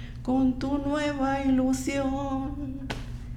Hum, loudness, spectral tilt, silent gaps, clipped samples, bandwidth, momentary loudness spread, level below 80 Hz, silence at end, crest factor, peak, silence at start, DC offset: none; -28 LUFS; -6 dB/octave; none; under 0.1%; 14 kHz; 11 LU; -40 dBFS; 0 s; 12 dB; -14 dBFS; 0 s; under 0.1%